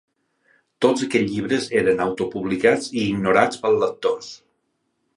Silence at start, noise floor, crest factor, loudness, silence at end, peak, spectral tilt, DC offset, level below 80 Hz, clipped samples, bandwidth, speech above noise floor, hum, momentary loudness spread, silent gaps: 0.8 s; -72 dBFS; 22 dB; -21 LUFS; 0.8 s; 0 dBFS; -5 dB/octave; under 0.1%; -56 dBFS; under 0.1%; 11.5 kHz; 52 dB; none; 7 LU; none